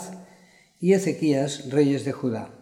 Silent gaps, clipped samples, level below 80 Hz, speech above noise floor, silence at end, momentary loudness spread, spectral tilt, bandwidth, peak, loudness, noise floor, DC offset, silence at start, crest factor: none; under 0.1%; -70 dBFS; 32 dB; 0.05 s; 9 LU; -6.5 dB/octave; 15.5 kHz; -8 dBFS; -24 LUFS; -55 dBFS; under 0.1%; 0 s; 16 dB